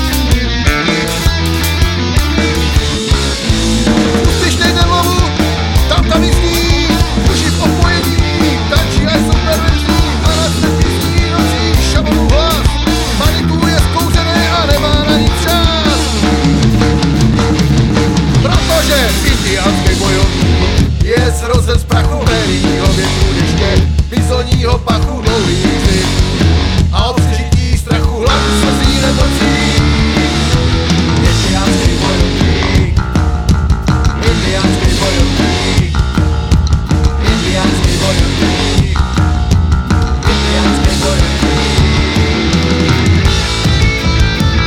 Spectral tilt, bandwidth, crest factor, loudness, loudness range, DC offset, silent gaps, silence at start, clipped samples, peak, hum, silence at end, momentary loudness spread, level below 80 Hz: -5 dB/octave; 18 kHz; 10 dB; -11 LUFS; 1 LU; under 0.1%; none; 0 s; under 0.1%; 0 dBFS; none; 0 s; 2 LU; -16 dBFS